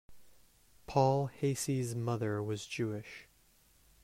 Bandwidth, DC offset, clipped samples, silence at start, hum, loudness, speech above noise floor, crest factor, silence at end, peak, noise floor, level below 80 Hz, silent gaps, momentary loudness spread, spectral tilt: 16 kHz; under 0.1%; under 0.1%; 0.1 s; none; -34 LUFS; 33 dB; 22 dB; 0.8 s; -14 dBFS; -67 dBFS; -66 dBFS; none; 11 LU; -6 dB/octave